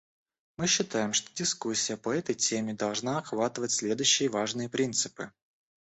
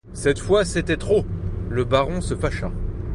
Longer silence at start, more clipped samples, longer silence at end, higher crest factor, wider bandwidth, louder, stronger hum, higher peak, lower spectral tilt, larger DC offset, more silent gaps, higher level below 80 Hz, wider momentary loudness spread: first, 0.6 s vs 0.05 s; neither; first, 0.65 s vs 0 s; about the same, 22 dB vs 18 dB; second, 8.4 kHz vs 11.5 kHz; second, -29 LUFS vs -23 LUFS; neither; second, -8 dBFS vs -4 dBFS; second, -2.5 dB/octave vs -5.5 dB/octave; neither; neither; second, -70 dBFS vs -32 dBFS; about the same, 7 LU vs 9 LU